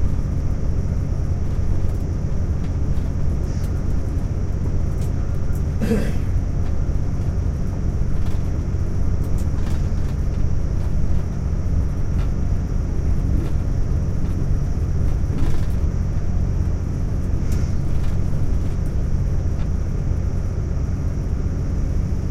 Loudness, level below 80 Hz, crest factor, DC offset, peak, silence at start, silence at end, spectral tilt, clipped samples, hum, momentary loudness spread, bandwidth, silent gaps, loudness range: -24 LUFS; -22 dBFS; 12 dB; under 0.1%; -6 dBFS; 0 s; 0 s; -8 dB/octave; under 0.1%; none; 2 LU; 7.8 kHz; none; 1 LU